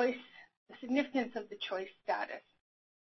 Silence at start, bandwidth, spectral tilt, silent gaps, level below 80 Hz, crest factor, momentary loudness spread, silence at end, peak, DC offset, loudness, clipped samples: 0 s; 6 kHz; -1.5 dB/octave; 0.57-0.66 s; -80 dBFS; 20 dB; 20 LU; 0.65 s; -18 dBFS; under 0.1%; -37 LUFS; under 0.1%